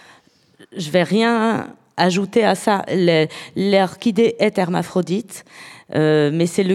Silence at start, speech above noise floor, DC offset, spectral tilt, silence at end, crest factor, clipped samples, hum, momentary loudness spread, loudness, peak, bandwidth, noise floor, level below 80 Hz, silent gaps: 0.75 s; 35 dB; under 0.1%; -5.5 dB/octave; 0 s; 18 dB; under 0.1%; none; 14 LU; -18 LUFS; 0 dBFS; 14.5 kHz; -52 dBFS; -66 dBFS; none